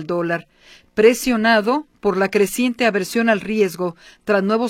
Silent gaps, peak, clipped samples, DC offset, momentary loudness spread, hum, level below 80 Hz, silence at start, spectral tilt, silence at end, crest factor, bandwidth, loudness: none; 0 dBFS; under 0.1%; under 0.1%; 11 LU; none; -52 dBFS; 0 s; -4.5 dB/octave; 0 s; 18 dB; 16.5 kHz; -18 LUFS